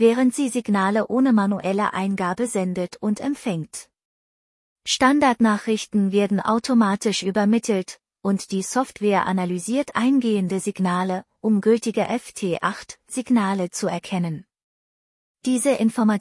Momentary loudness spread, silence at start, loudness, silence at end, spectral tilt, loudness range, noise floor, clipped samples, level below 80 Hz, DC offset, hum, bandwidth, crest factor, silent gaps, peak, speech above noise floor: 8 LU; 0 s; -22 LUFS; 0 s; -5 dB/octave; 5 LU; under -90 dBFS; under 0.1%; -64 dBFS; under 0.1%; none; 12 kHz; 18 dB; 4.05-4.76 s, 14.63-15.35 s; -4 dBFS; over 69 dB